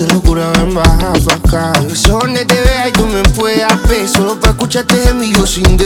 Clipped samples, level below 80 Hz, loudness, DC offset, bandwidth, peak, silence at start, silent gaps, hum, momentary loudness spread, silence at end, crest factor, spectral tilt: 0.7%; -14 dBFS; -11 LUFS; under 0.1%; 19 kHz; 0 dBFS; 0 s; none; none; 2 LU; 0 s; 10 dB; -4.5 dB/octave